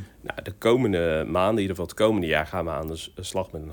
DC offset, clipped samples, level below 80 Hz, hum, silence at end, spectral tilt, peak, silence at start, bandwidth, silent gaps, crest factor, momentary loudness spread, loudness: under 0.1%; under 0.1%; -48 dBFS; none; 0 s; -5.5 dB/octave; -6 dBFS; 0 s; 19.5 kHz; none; 18 dB; 12 LU; -25 LUFS